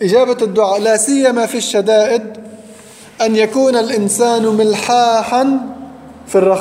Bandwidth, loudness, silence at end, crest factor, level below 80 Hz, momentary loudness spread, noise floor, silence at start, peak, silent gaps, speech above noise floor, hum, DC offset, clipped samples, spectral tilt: 16 kHz; -13 LUFS; 0 s; 12 dB; -58 dBFS; 7 LU; -38 dBFS; 0 s; -2 dBFS; none; 25 dB; none; under 0.1%; under 0.1%; -3.5 dB/octave